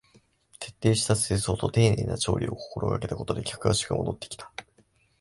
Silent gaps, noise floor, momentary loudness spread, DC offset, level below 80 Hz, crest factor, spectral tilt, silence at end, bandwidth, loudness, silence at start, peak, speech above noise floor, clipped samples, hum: none; -64 dBFS; 16 LU; under 0.1%; -46 dBFS; 20 dB; -5 dB/octave; 0.6 s; 11.5 kHz; -27 LUFS; 0.6 s; -8 dBFS; 38 dB; under 0.1%; none